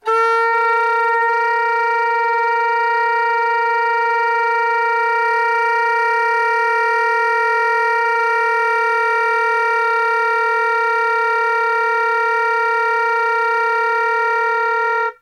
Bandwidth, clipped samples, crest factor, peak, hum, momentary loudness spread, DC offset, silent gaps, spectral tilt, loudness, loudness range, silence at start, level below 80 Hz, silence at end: 11 kHz; under 0.1%; 10 dB; -6 dBFS; none; 1 LU; under 0.1%; none; 1 dB/octave; -16 LUFS; 1 LU; 0.05 s; -78 dBFS; 0.1 s